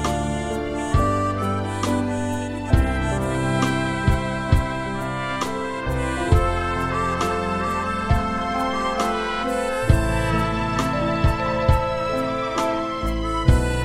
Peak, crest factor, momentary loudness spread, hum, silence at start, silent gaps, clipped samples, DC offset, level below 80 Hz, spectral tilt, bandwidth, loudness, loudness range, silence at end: -4 dBFS; 18 dB; 5 LU; none; 0 s; none; under 0.1%; under 0.1%; -28 dBFS; -6 dB/octave; 15.5 kHz; -22 LUFS; 2 LU; 0 s